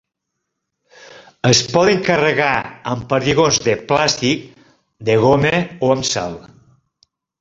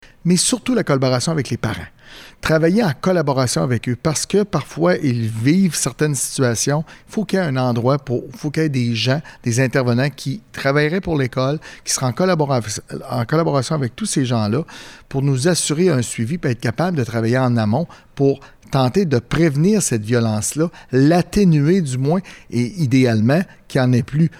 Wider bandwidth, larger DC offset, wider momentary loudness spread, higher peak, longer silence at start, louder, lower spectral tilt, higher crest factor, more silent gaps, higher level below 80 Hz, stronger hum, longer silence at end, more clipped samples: second, 8 kHz vs 16 kHz; neither; about the same, 10 LU vs 8 LU; first, 0 dBFS vs -4 dBFS; first, 1.1 s vs 0.25 s; about the same, -16 LUFS vs -18 LUFS; second, -4 dB/octave vs -5.5 dB/octave; first, 18 dB vs 12 dB; neither; about the same, -48 dBFS vs -46 dBFS; neither; first, 1 s vs 0 s; neither